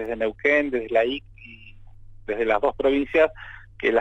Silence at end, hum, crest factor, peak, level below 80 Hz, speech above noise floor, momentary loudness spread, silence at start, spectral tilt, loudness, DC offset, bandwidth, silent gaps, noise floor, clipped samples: 0 s; none; 18 dB; -6 dBFS; -48 dBFS; 21 dB; 21 LU; 0 s; -6 dB/octave; -23 LUFS; under 0.1%; 8 kHz; none; -44 dBFS; under 0.1%